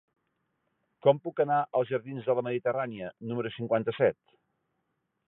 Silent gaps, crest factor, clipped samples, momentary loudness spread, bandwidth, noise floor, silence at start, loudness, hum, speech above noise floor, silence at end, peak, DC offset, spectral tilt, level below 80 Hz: none; 22 dB; under 0.1%; 9 LU; 4 kHz; -80 dBFS; 1.05 s; -29 LUFS; none; 51 dB; 1.15 s; -8 dBFS; under 0.1%; -10.5 dB/octave; -74 dBFS